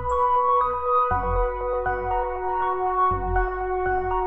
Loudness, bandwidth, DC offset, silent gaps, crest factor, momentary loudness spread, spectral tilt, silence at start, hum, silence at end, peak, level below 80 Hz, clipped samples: -23 LUFS; 8 kHz; under 0.1%; none; 12 dB; 5 LU; -8 dB/octave; 0 s; none; 0 s; -12 dBFS; -34 dBFS; under 0.1%